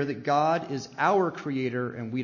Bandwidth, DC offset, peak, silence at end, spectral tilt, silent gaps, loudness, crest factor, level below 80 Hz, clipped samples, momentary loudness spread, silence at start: 7.4 kHz; under 0.1%; -10 dBFS; 0 s; -6.5 dB/octave; none; -27 LUFS; 18 dB; -70 dBFS; under 0.1%; 8 LU; 0 s